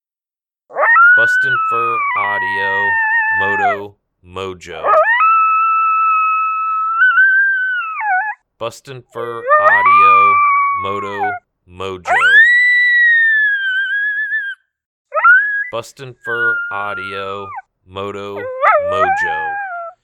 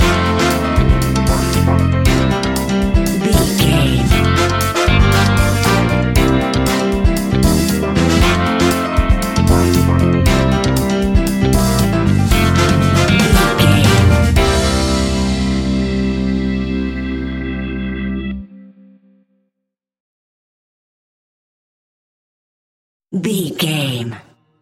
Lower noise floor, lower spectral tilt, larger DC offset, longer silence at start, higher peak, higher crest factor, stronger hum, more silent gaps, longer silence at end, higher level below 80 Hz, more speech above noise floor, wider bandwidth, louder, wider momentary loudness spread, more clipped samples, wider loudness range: first, under -90 dBFS vs -79 dBFS; second, -3.5 dB/octave vs -5.5 dB/octave; neither; first, 0.7 s vs 0 s; about the same, 0 dBFS vs 0 dBFS; about the same, 14 dB vs 14 dB; neither; second, 14.86-15.05 s vs 20.00-23.00 s; second, 0.15 s vs 0.4 s; second, -60 dBFS vs -22 dBFS; first, over 75 dB vs 60 dB; second, 12.5 kHz vs 17 kHz; about the same, -12 LUFS vs -14 LUFS; first, 19 LU vs 9 LU; neither; second, 7 LU vs 12 LU